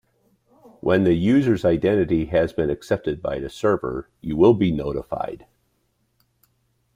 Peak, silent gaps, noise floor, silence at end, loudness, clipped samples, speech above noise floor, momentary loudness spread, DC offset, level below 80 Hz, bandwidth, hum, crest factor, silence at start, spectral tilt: -4 dBFS; none; -69 dBFS; 1.6 s; -21 LUFS; under 0.1%; 48 dB; 12 LU; under 0.1%; -46 dBFS; 11 kHz; none; 18 dB; 0.85 s; -8 dB/octave